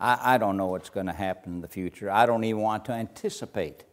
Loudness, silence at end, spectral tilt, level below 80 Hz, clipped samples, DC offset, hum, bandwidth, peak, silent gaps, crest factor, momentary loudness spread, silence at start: -27 LUFS; 0.1 s; -5.5 dB/octave; -60 dBFS; under 0.1%; under 0.1%; none; 16 kHz; -6 dBFS; none; 22 dB; 12 LU; 0 s